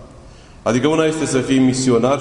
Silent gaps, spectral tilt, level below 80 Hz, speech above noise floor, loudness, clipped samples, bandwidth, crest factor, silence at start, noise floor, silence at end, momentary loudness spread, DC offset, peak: none; -5 dB/octave; -44 dBFS; 25 dB; -17 LUFS; under 0.1%; 11 kHz; 14 dB; 0 s; -40 dBFS; 0 s; 5 LU; under 0.1%; -2 dBFS